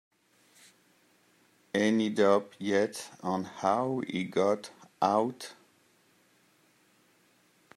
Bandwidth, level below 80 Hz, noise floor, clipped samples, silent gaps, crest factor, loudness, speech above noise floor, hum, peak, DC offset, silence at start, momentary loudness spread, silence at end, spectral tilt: 14.5 kHz; -80 dBFS; -66 dBFS; under 0.1%; none; 22 dB; -29 LUFS; 38 dB; none; -10 dBFS; under 0.1%; 1.75 s; 9 LU; 2.25 s; -5.5 dB/octave